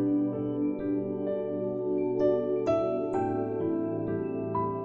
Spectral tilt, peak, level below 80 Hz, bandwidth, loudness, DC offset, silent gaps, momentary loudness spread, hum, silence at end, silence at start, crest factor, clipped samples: -9.5 dB/octave; -14 dBFS; -60 dBFS; 7 kHz; -30 LUFS; under 0.1%; none; 5 LU; none; 0 s; 0 s; 14 dB; under 0.1%